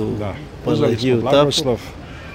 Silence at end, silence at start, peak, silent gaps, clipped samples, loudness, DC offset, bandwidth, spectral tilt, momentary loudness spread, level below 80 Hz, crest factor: 0 s; 0 s; -2 dBFS; none; under 0.1%; -18 LUFS; under 0.1%; 16 kHz; -5.5 dB/octave; 14 LU; -40 dBFS; 16 dB